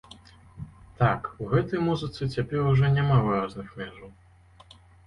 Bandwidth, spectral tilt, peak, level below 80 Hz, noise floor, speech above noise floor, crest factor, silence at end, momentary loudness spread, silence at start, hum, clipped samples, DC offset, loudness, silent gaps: 9.4 kHz; -8.5 dB/octave; -8 dBFS; -48 dBFS; -53 dBFS; 28 dB; 18 dB; 0.95 s; 20 LU; 0.55 s; none; under 0.1%; under 0.1%; -25 LUFS; none